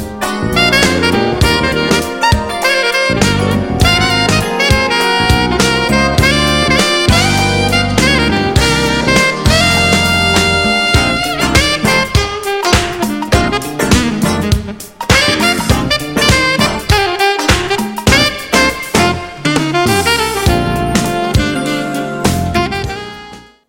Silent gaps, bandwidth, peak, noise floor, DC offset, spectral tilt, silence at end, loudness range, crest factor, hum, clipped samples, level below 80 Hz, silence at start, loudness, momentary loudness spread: none; 17 kHz; 0 dBFS; -34 dBFS; under 0.1%; -4 dB/octave; 0.25 s; 3 LU; 12 dB; none; under 0.1%; -24 dBFS; 0 s; -11 LUFS; 6 LU